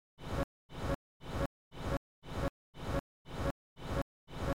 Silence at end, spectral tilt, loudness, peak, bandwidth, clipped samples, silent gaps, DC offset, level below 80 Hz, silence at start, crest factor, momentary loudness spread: 0.05 s; -6.5 dB/octave; -41 LUFS; -22 dBFS; 17 kHz; under 0.1%; 0.44-0.69 s, 0.95-1.20 s, 1.46-1.71 s, 1.97-2.22 s, 2.49-2.73 s, 3.00-3.25 s, 3.51-3.76 s, 4.02-4.27 s; 0.3%; -46 dBFS; 0.15 s; 18 dB; 5 LU